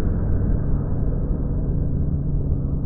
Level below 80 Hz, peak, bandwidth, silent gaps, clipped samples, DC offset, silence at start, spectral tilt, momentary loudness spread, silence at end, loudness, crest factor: -24 dBFS; -8 dBFS; 1.9 kHz; none; under 0.1%; under 0.1%; 0 s; -15.5 dB/octave; 2 LU; 0 s; -24 LUFS; 12 dB